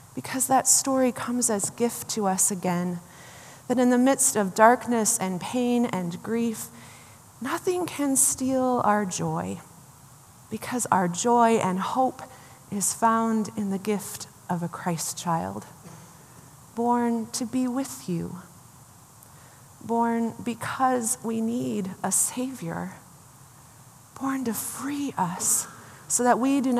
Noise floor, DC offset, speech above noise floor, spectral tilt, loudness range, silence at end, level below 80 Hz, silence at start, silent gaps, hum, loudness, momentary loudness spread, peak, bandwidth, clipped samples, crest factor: -51 dBFS; under 0.1%; 26 dB; -4 dB/octave; 7 LU; 0 s; -68 dBFS; 0 s; none; none; -25 LUFS; 17 LU; -2 dBFS; 15 kHz; under 0.1%; 24 dB